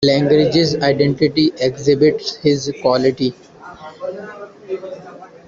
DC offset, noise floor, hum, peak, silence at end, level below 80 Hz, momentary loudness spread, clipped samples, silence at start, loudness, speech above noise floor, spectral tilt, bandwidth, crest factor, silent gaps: under 0.1%; -38 dBFS; none; -2 dBFS; 0.2 s; -50 dBFS; 20 LU; under 0.1%; 0 s; -16 LUFS; 22 dB; -6 dB/octave; 7.4 kHz; 14 dB; none